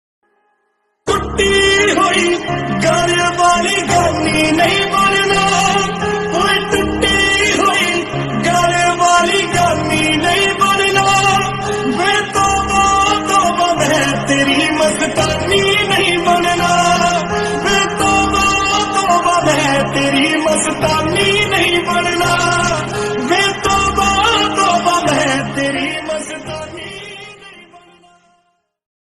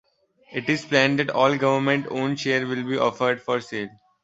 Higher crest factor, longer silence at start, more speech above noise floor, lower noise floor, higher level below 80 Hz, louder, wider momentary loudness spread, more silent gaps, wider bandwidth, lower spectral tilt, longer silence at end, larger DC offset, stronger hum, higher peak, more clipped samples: second, 14 dB vs 22 dB; first, 1.05 s vs 0.5 s; first, 51 dB vs 34 dB; first, -65 dBFS vs -57 dBFS; first, -36 dBFS vs -64 dBFS; first, -13 LUFS vs -23 LUFS; second, 7 LU vs 11 LU; neither; first, 15.5 kHz vs 8 kHz; second, -3 dB/octave vs -5.5 dB/octave; first, 1.3 s vs 0.35 s; neither; neither; about the same, 0 dBFS vs -2 dBFS; neither